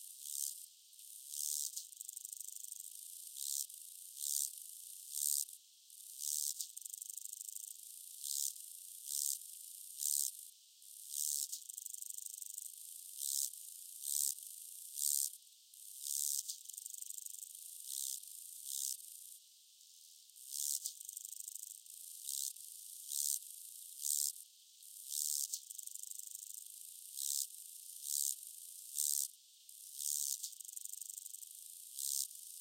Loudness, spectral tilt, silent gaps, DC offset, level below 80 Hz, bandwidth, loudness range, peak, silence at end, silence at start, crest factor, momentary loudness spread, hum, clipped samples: -41 LUFS; 9.5 dB/octave; none; under 0.1%; under -90 dBFS; 16.5 kHz; 4 LU; -18 dBFS; 0 s; 0 s; 26 dB; 16 LU; none; under 0.1%